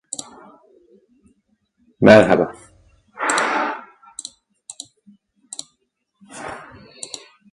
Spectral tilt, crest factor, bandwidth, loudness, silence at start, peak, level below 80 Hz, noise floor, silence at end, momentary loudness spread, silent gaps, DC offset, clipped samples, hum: -4.5 dB/octave; 22 dB; 11.5 kHz; -16 LUFS; 2 s; 0 dBFS; -56 dBFS; -71 dBFS; 0.35 s; 26 LU; none; under 0.1%; under 0.1%; none